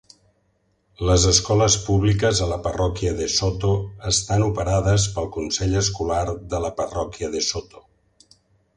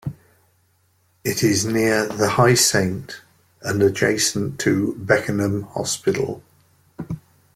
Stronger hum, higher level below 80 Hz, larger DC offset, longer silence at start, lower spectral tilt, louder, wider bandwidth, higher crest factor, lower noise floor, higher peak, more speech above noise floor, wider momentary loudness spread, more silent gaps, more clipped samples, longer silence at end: neither; first, -34 dBFS vs -52 dBFS; neither; first, 1 s vs 0.05 s; about the same, -4 dB/octave vs -4 dB/octave; about the same, -21 LUFS vs -20 LUFS; second, 10.5 kHz vs 16.5 kHz; about the same, 20 dB vs 20 dB; first, -66 dBFS vs -62 dBFS; about the same, -2 dBFS vs -2 dBFS; about the same, 45 dB vs 43 dB; second, 10 LU vs 18 LU; neither; neither; first, 1.15 s vs 0.35 s